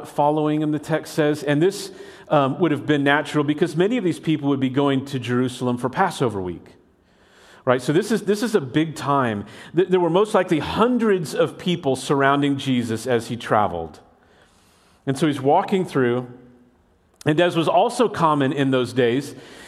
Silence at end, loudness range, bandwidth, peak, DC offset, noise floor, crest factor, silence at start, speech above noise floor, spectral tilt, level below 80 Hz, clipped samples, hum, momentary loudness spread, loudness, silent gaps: 0 s; 3 LU; 14.5 kHz; -2 dBFS; under 0.1%; -59 dBFS; 20 dB; 0 s; 38 dB; -6 dB/octave; -58 dBFS; under 0.1%; none; 7 LU; -21 LUFS; none